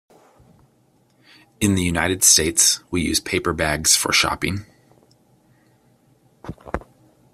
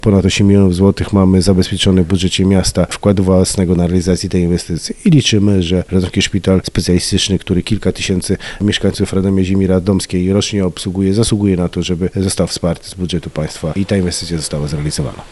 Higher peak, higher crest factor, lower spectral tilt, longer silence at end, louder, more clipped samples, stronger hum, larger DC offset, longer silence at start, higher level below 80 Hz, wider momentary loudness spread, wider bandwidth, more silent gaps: about the same, 0 dBFS vs 0 dBFS; first, 22 dB vs 12 dB; second, -2 dB/octave vs -5.5 dB/octave; first, 0.55 s vs 0 s; second, -17 LUFS vs -14 LUFS; neither; neither; second, under 0.1% vs 0.2%; first, 1.6 s vs 0.05 s; second, -46 dBFS vs -32 dBFS; first, 19 LU vs 8 LU; first, 15.5 kHz vs 12 kHz; neither